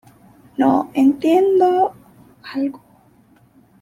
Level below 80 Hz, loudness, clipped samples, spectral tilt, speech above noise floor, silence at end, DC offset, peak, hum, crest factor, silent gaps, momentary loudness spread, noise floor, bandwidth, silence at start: -62 dBFS; -17 LUFS; under 0.1%; -6.5 dB/octave; 37 dB; 1.05 s; under 0.1%; -4 dBFS; none; 16 dB; none; 11 LU; -53 dBFS; 14 kHz; 0.6 s